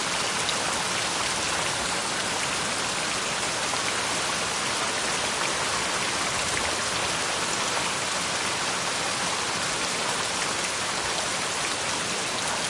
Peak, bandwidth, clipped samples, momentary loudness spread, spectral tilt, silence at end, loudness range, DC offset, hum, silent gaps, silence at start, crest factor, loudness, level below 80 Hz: -10 dBFS; 11.5 kHz; under 0.1%; 1 LU; -1 dB/octave; 0 s; 1 LU; under 0.1%; none; none; 0 s; 18 dB; -25 LUFS; -56 dBFS